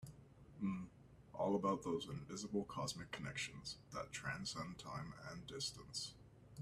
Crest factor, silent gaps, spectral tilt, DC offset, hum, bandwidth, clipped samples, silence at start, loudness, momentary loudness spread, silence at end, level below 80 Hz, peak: 20 dB; none; -4.5 dB/octave; under 0.1%; none; 14 kHz; under 0.1%; 0 s; -45 LUFS; 17 LU; 0 s; -68 dBFS; -26 dBFS